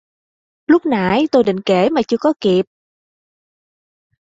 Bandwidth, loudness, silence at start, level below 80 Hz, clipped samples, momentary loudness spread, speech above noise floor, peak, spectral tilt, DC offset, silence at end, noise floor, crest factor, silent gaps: 7.8 kHz; -15 LUFS; 0.7 s; -54 dBFS; under 0.1%; 4 LU; over 75 dB; -2 dBFS; -6.5 dB/octave; under 0.1%; 1.6 s; under -90 dBFS; 16 dB; none